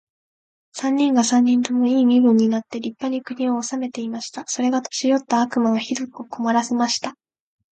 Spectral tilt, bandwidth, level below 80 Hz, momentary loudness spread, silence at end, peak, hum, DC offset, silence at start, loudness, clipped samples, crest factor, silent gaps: -4 dB/octave; 9 kHz; -72 dBFS; 12 LU; 0.6 s; -4 dBFS; none; under 0.1%; 0.75 s; -20 LUFS; under 0.1%; 18 dB; none